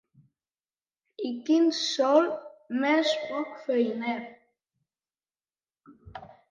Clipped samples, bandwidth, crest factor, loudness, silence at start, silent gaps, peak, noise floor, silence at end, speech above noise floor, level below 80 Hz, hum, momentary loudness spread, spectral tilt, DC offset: under 0.1%; 9.2 kHz; 20 dB; -27 LUFS; 1.2 s; none; -10 dBFS; under -90 dBFS; 0.2 s; over 64 dB; -68 dBFS; none; 23 LU; -3.5 dB/octave; under 0.1%